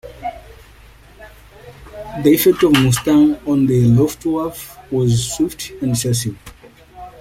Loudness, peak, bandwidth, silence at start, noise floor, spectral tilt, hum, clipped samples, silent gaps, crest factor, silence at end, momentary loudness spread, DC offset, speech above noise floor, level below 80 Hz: -16 LUFS; 0 dBFS; 16.5 kHz; 0.05 s; -43 dBFS; -5.5 dB/octave; none; under 0.1%; none; 18 dB; 0.1 s; 17 LU; under 0.1%; 28 dB; -42 dBFS